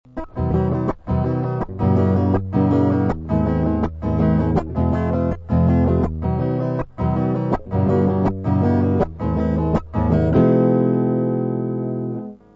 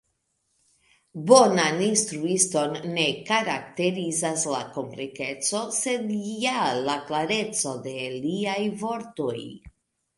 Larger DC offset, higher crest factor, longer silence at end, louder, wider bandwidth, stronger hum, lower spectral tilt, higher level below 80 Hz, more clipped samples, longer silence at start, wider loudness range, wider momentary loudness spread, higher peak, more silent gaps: neither; second, 14 dB vs 24 dB; second, 0.2 s vs 0.5 s; first, -20 LUFS vs -25 LUFS; second, 5.8 kHz vs 11.5 kHz; neither; first, -11 dB/octave vs -3 dB/octave; first, -32 dBFS vs -66 dBFS; neither; second, 0.15 s vs 1.15 s; second, 2 LU vs 5 LU; second, 7 LU vs 11 LU; about the same, -4 dBFS vs -2 dBFS; neither